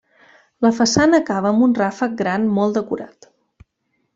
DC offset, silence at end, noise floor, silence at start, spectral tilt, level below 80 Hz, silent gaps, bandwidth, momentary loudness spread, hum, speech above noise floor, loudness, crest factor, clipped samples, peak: under 0.1%; 1.1 s; -70 dBFS; 0.6 s; -5 dB/octave; -54 dBFS; none; 8 kHz; 10 LU; none; 53 dB; -18 LUFS; 16 dB; under 0.1%; -2 dBFS